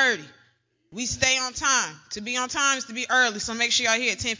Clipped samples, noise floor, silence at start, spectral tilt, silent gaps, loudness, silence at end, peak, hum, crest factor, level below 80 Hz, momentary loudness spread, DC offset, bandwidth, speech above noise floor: under 0.1%; -66 dBFS; 0 s; -0.5 dB/octave; none; -23 LUFS; 0 s; -6 dBFS; none; 20 dB; -54 dBFS; 10 LU; under 0.1%; 7.8 kHz; 40 dB